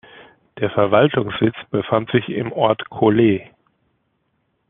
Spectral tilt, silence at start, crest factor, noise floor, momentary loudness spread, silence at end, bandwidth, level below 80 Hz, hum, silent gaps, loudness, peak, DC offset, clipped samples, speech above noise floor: -5.5 dB/octave; 0.2 s; 18 dB; -68 dBFS; 10 LU; 1.25 s; 3.9 kHz; -56 dBFS; none; none; -18 LUFS; -2 dBFS; under 0.1%; under 0.1%; 51 dB